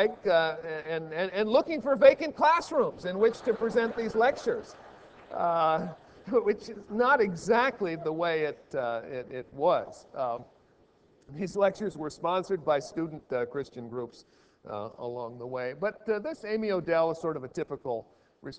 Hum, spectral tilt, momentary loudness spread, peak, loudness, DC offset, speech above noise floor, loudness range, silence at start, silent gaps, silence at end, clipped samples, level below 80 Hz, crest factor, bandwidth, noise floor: none; -5.5 dB/octave; 14 LU; -6 dBFS; -29 LUFS; under 0.1%; 35 dB; 8 LU; 0 s; none; 0 s; under 0.1%; -66 dBFS; 22 dB; 8 kHz; -63 dBFS